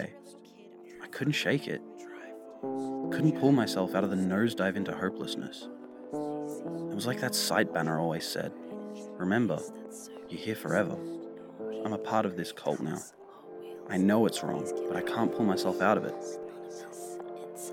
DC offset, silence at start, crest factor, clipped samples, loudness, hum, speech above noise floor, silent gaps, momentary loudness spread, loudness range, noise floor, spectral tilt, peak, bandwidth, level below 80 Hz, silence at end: under 0.1%; 0 s; 22 dB; under 0.1%; -31 LUFS; none; 22 dB; none; 18 LU; 4 LU; -52 dBFS; -5 dB/octave; -10 dBFS; 18.5 kHz; -76 dBFS; 0 s